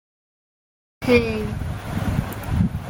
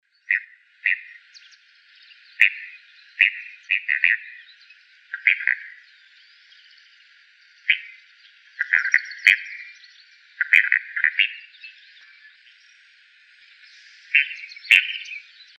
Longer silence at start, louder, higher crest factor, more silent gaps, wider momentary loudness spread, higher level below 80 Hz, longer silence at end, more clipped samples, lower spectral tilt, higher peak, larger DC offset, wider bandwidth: first, 1 s vs 0.3 s; second, -23 LUFS vs -20 LUFS; second, 20 dB vs 26 dB; neither; second, 10 LU vs 23 LU; first, -34 dBFS vs -90 dBFS; second, 0 s vs 0.4 s; neither; first, -7 dB/octave vs 4.5 dB/octave; second, -4 dBFS vs 0 dBFS; neither; first, 17 kHz vs 9 kHz